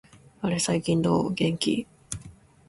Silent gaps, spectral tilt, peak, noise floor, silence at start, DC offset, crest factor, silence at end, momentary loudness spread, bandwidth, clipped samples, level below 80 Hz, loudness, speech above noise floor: none; -5 dB/octave; -10 dBFS; -49 dBFS; 0.4 s; under 0.1%; 16 dB; 0.35 s; 14 LU; 11.5 kHz; under 0.1%; -54 dBFS; -26 LUFS; 24 dB